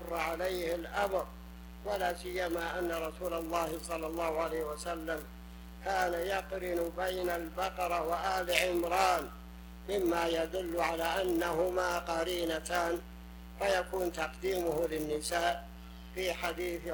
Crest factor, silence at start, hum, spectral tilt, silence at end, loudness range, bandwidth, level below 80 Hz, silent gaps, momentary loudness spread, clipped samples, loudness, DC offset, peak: 26 dB; 0 s; none; -4 dB/octave; 0 s; 4 LU; 19.5 kHz; -50 dBFS; none; 13 LU; under 0.1%; -34 LUFS; under 0.1%; -10 dBFS